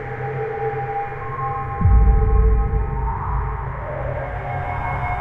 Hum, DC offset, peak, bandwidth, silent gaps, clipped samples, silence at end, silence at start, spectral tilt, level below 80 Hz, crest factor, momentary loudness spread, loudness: none; under 0.1%; -4 dBFS; 3.5 kHz; none; under 0.1%; 0 s; 0 s; -10 dB/octave; -22 dBFS; 16 dB; 10 LU; -22 LUFS